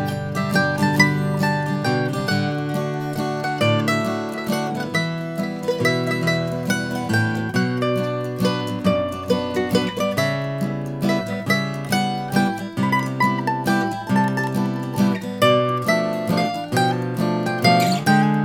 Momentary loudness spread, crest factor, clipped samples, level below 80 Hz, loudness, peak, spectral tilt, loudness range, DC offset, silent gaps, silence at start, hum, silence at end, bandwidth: 7 LU; 20 dB; under 0.1%; -54 dBFS; -21 LUFS; 0 dBFS; -5.5 dB/octave; 2 LU; under 0.1%; none; 0 s; none; 0 s; 18 kHz